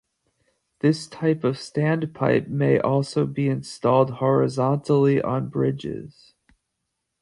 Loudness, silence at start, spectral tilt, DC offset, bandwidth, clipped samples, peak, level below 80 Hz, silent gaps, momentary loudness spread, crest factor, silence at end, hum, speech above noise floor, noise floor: -22 LUFS; 0.85 s; -7.5 dB/octave; under 0.1%; 11 kHz; under 0.1%; -6 dBFS; -58 dBFS; none; 6 LU; 18 dB; 1.15 s; none; 57 dB; -79 dBFS